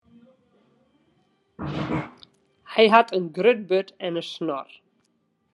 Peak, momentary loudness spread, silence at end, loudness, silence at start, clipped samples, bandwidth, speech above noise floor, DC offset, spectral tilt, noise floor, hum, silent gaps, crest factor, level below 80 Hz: -2 dBFS; 17 LU; 0.9 s; -23 LUFS; 1.6 s; under 0.1%; 11 kHz; 48 dB; under 0.1%; -6 dB/octave; -70 dBFS; none; none; 24 dB; -62 dBFS